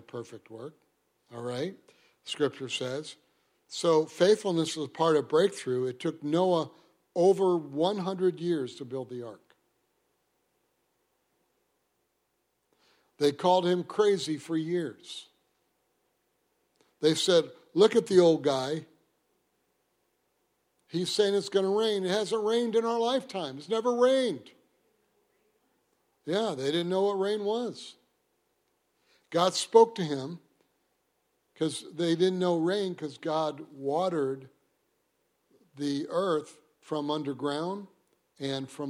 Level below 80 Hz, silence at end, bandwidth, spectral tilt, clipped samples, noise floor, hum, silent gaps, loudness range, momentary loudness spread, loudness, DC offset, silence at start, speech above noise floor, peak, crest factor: -80 dBFS; 0 s; 14.5 kHz; -5 dB/octave; under 0.1%; -77 dBFS; none; none; 7 LU; 17 LU; -28 LUFS; under 0.1%; 0.15 s; 49 dB; -6 dBFS; 24 dB